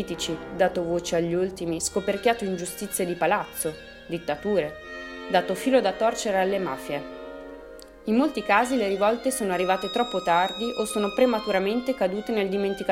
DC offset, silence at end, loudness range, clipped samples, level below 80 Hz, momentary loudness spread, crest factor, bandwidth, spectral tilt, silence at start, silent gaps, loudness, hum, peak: under 0.1%; 0 s; 3 LU; under 0.1%; -54 dBFS; 12 LU; 20 dB; 16.5 kHz; -4 dB/octave; 0 s; none; -25 LUFS; none; -6 dBFS